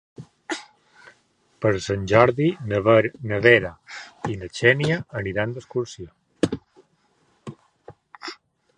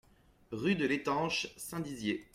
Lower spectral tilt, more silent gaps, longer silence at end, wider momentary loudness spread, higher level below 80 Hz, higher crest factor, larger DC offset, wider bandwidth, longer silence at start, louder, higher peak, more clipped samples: first, -6 dB/octave vs -4.5 dB/octave; neither; first, 0.45 s vs 0.1 s; first, 23 LU vs 9 LU; first, -52 dBFS vs -66 dBFS; first, 24 dB vs 18 dB; neither; second, 11 kHz vs 16 kHz; second, 0.2 s vs 0.5 s; first, -22 LUFS vs -34 LUFS; first, 0 dBFS vs -18 dBFS; neither